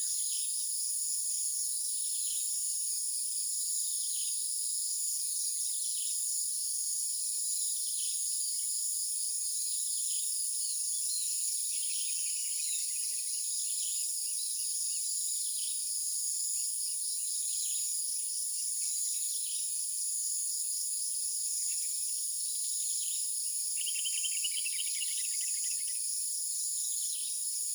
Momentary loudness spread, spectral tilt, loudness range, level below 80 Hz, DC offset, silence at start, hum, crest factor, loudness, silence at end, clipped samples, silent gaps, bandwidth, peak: 1 LU; 12.5 dB/octave; 1 LU; under -90 dBFS; under 0.1%; 0 s; none; 14 dB; -31 LUFS; 0 s; under 0.1%; none; over 20 kHz; -20 dBFS